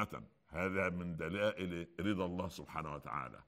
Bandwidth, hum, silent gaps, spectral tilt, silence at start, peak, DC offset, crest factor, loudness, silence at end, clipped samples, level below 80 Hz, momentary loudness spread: 16 kHz; none; none; -6.5 dB/octave; 0 s; -22 dBFS; under 0.1%; 18 dB; -40 LUFS; 0.05 s; under 0.1%; -62 dBFS; 7 LU